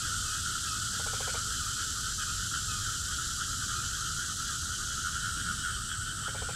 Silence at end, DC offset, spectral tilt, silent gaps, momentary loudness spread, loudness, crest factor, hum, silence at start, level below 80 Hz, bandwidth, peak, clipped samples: 0 s; under 0.1%; -0.5 dB/octave; none; 2 LU; -32 LUFS; 14 dB; none; 0 s; -46 dBFS; 16 kHz; -20 dBFS; under 0.1%